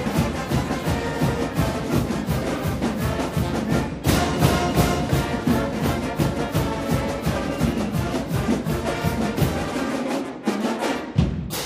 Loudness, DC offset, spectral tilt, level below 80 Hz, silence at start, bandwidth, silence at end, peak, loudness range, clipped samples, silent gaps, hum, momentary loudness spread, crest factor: -23 LUFS; under 0.1%; -6 dB/octave; -34 dBFS; 0 s; 15.5 kHz; 0 s; -6 dBFS; 2 LU; under 0.1%; none; none; 4 LU; 18 dB